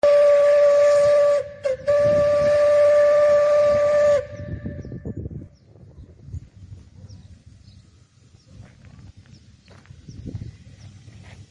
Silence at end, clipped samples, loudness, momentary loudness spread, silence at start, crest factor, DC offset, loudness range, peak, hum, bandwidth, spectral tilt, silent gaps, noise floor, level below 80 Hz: 0.65 s; under 0.1%; -17 LUFS; 23 LU; 0.05 s; 12 dB; under 0.1%; 21 LU; -8 dBFS; none; 9.4 kHz; -5.5 dB/octave; none; -53 dBFS; -48 dBFS